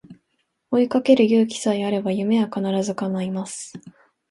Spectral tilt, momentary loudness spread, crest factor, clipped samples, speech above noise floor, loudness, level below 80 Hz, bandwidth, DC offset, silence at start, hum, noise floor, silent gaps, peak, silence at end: -6 dB/octave; 12 LU; 18 dB; under 0.1%; 52 dB; -21 LUFS; -66 dBFS; 11.5 kHz; under 0.1%; 0.1 s; none; -72 dBFS; none; -4 dBFS; 0.4 s